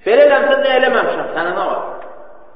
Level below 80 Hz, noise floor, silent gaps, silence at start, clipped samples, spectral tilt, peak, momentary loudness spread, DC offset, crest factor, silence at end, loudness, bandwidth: -56 dBFS; -38 dBFS; none; 0 s; under 0.1%; -0.5 dB/octave; 0 dBFS; 14 LU; 2%; 14 dB; 0.3 s; -14 LUFS; 5.4 kHz